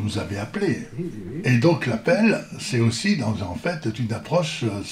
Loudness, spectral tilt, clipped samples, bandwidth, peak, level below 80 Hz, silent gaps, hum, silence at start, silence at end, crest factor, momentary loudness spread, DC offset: -23 LUFS; -6 dB/octave; under 0.1%; 13 kHz; -6 dBFS; -54 dBFS; none; none; 0 s; 0 s; 16 dB; 9 LU; under 0.1%